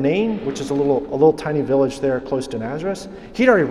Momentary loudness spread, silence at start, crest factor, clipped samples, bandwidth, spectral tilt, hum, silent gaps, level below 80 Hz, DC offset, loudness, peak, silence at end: 10 LU; 0 s; 18 dB; under 0.1%; 12 kHz; -6.5 dB/octave; none; none; -48 dBFS; under 0.1%; -20 LUFS; -2 dBFS; 0 s